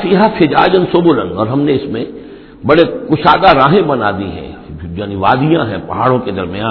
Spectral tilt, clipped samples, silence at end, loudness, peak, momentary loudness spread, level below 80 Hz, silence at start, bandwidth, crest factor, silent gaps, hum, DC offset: -9 dB/octave; 0.4%; 0 s; -12 LUFS; 0 dBFS; 15 LU; -38 dBFS; 0 s; 5.4 kHz; 12 dB; none; none; under 0.1%